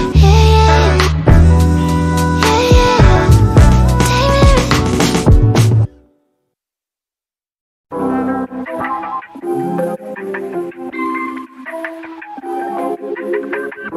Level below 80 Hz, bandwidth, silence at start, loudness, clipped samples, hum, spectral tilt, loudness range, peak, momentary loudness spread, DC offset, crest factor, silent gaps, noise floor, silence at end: -18 dBFS; 14.5 kHz; 0 s; -13 LUFS; 0.3%; none; -6 dB/octave; 12 LU; 0 dBFS; 16 LU; under 0.1%; 12 dB; 7.61-7.84 s; under -90 dBFS; 0 s